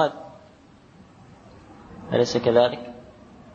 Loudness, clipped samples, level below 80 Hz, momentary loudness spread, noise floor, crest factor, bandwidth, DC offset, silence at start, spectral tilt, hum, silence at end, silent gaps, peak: -22 LUFS; under 0.1%; -58 dBFS; 25 LU; -51 dBFS; 20 dB; 7.8 kHz; under 0.1%; 0 s; -5.5 dB/octave; none; 0.5 s; none; -6 dBFS